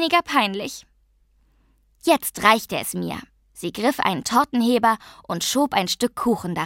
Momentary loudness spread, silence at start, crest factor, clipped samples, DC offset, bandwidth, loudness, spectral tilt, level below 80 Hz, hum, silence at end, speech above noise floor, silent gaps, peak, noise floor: 13 LU; 0 s; 22 dB; under 0.1%; under 0.1%; 16.5 kHz; -21 LUFS; -3.5 dB/octave; -56 dBFS; none; 0 s; 39 dB; none; 0 dBFS; -61 dBFS